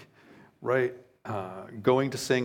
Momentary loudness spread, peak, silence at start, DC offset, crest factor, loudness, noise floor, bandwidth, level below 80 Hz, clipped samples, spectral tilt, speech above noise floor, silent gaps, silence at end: 13 LU; -10 dBFS; 0 s; under 0.1%; 20 dB; -29 LUFS; -56 dBFS; 17 kHz; -72 dBFS; under 0.1%; -5.5 dB/octave; 28 dB; none; 0 s